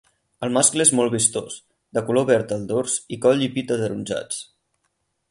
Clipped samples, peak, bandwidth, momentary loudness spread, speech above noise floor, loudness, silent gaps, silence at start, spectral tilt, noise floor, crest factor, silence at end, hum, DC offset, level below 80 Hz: under 0.1%; -2 dBFS; 11.5 kHz; 14 LU; 52 dB; -21 LUFS; none; 0.4 s; -3.5 dB/octave; -73 dBFS; 20 dB; 0.85 s; none; under 0.1%; -60 dBFS